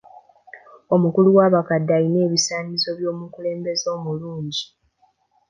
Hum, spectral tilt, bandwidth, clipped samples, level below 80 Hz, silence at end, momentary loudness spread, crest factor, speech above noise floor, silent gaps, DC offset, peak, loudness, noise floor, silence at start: none; -5 dB/octave; 9.8 kHz; under 0.1%; -66 dBFS; 0.85 s; 14 LU; 20 dB; 43 dB; none; under 0.1%; -2 dBFS; -20 LUFS; -63 dBFS; 0.55 s